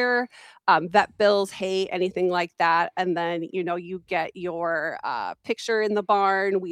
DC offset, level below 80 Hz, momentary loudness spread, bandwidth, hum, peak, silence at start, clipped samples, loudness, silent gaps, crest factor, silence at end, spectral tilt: under 0.1%; -70 dBFS; 9 LU; 12.5 kHz; none; -4 dBFS; 0 s; under 0.1%; -24 LUFS; none; 20 dB; 0 s; -5 dB/octave